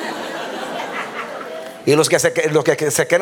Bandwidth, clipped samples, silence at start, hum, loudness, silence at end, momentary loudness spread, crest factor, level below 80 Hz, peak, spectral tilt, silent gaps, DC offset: 18 kHz; under 0.1%; 0 s; none; -19 LUFS; 0 s; 13 LU; 18 dB; -64 dBFS; -2 dBFS; -3.5 dB/octave; none; under 0.1%